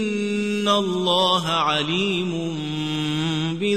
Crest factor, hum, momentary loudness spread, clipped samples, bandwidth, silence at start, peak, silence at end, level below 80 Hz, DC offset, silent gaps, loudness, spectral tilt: 16 dB; none; 7 LU; under 0.1%; 13.5 kHz; 0 s; -6 dBFS; 0 s; -58 dBFS; 0.3%; none; -22 LUFS; -5 dB/octave